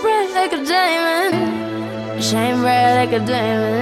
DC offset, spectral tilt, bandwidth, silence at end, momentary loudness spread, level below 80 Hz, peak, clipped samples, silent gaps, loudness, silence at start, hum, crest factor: under 0.1%; -4.5 dB/octave; 16.5 kHz; 0 s; 9 LU; -58 dBFS; -4 dBFS; under 0.1%; none; -17 LUFS; 0 s; none; 14 dB